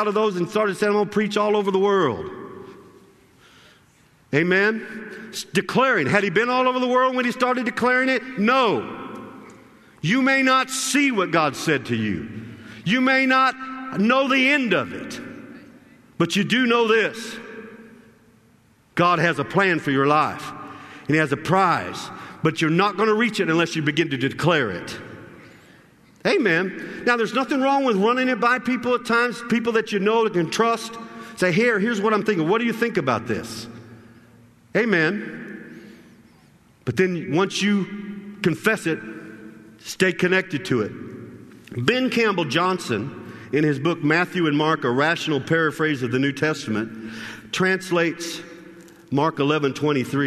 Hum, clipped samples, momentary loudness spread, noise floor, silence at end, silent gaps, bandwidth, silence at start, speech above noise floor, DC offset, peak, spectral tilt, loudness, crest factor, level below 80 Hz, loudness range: none; under 0.1%; 17 LU; -57 dBFS; 0 s; none; 13.5 kHz; 0 s; 36 dB; under 0.1%; -2 dBFS; -5 dB/octave; -21 LUFS; 20 dB; -62 dBFS; 4 LU